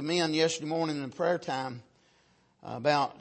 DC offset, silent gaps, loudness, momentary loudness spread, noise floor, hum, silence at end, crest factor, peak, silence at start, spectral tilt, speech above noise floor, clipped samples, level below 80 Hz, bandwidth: under 0.1%; none; -30 LUFS; 15 LU; -66 dBFS; none; 0 s; 20 dB; -12 dBFS; 0 s; -4.5 dB/octave; 37 dB; under 0.1%; -74 dBFS; 8.8 kHz